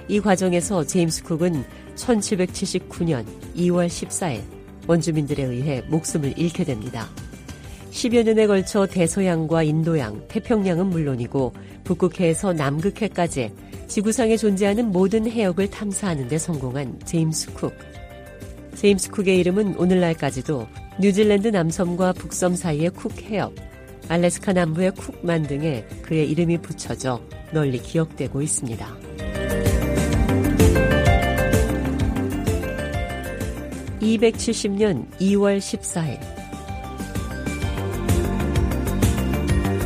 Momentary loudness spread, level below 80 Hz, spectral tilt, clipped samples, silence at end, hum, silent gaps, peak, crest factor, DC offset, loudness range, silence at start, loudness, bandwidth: 13 LU; -34 dBFS; -5.5 dB/octave; under 0.1%; 0 s; none; none; -4 dBFS; 18 dB; under 0.1%; 4 LU; 0 s; -22 LUFS; 15.5 kHz